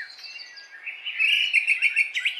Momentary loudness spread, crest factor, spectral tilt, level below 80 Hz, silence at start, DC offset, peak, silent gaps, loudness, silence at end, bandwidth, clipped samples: 19 LU; 18 dB; 5.5 dB/octave; under -90 dBFS; 0 s; under 0.1%; -8 dBFS; none; -20 LUFS; 0 s; 13 kHz; under 0.1%